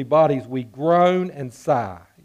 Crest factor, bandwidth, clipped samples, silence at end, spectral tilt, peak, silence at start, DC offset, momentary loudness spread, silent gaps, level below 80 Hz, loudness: 14 dB; 12.5 kHz; under 0.1%; 0.25 s; -7.5 dB/octave; -6 dBFS; 0 s; under 0.1%; 13 LU; none; -62 dBFS; -20 LUFS